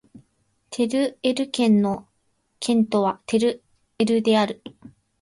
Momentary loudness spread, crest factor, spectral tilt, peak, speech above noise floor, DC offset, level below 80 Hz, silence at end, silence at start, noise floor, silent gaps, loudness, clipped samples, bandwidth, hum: 12 LU; 16 dB; -5.5 dB/octave; -8 dBFS; 48 dB; under 0.1%; -64 dBFS; 0.55 s; 0.7 s; -69 dBFS; none; -22 LUFS; under 0.1%; 11.5 kHz; none